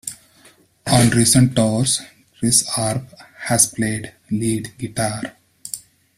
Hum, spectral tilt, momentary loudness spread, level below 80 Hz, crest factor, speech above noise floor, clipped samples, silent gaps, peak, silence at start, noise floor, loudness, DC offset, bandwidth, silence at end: none; -4 dB/octave; 18 LU; -46 dBFS; 20 dB; 34 dB; under 0.1%; none; 0 dBFS; 0.05 s; -52 dBFS; -18 LUFS; under 0.1%; 15.5 kHz; 0.4 s